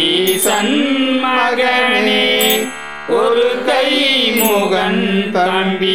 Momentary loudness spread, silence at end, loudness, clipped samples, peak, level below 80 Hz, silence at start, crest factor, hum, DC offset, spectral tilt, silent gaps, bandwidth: 4 LU; 0 s; -13 LUFS; under 0.1%; 0 dBFS; -52 dBFS; 0 s; 14 dB; none; 1%; -3 dB/octave; none; 19 kHz